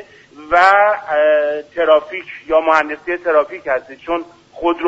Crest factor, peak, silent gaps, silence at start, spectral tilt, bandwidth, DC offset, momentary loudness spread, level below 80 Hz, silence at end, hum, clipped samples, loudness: 16 dB; 0 dBFS; none; 0 s; -4 dB/octave; 8 kHz; under 0.1%; 12 LU; -50 dBFS; 0 s; none; under 0.1%; -15 LUFS